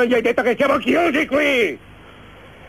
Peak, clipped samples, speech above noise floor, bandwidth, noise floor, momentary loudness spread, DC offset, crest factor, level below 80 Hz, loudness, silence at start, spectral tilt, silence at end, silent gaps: -4 dBFS; under 0.1%; 25 dB; 15.5 kHz; -42 dBFS; 4 LU; 0.1%; 14 dB; -50 dBFS; -17 LUFS; 0 s; -4.5 dB/octave; 0 s; none